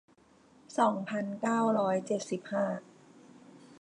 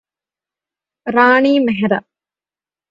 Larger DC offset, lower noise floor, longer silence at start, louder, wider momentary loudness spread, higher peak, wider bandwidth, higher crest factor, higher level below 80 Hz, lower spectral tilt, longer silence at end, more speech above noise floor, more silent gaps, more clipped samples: neither; second, -62 dBFS vs under -90 dBFS; second, 0.7 s vs 1.05 s; second, -31 LUFS vs -14 LUFS; second, 7 LU vs 10 LU; second, -14 dBFS vs 0 dBFS; first, 11 kHz vs 7.4 kHz; about the same, 18 dB vs 18 dB; second, -82 dBFS vs -60 dBFS; about the same, -6 dB/octave vs -7 dB/octave; second, 0.05 s vs 0.9 s; second, 32 dB vs over 77 dB; neither; neither